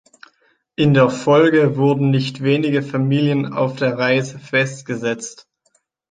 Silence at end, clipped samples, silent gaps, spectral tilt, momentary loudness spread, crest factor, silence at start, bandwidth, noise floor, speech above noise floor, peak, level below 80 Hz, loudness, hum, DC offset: 0.8 s; under 0.1%; none; -6.5 dB/octave; 9 LU; 16 dB; 0.8 s; 9.4 kHz; -64 dBFS; 48 dB; -2 dBFS; -58 dBFS; -17 LUFS; none; under 0.1%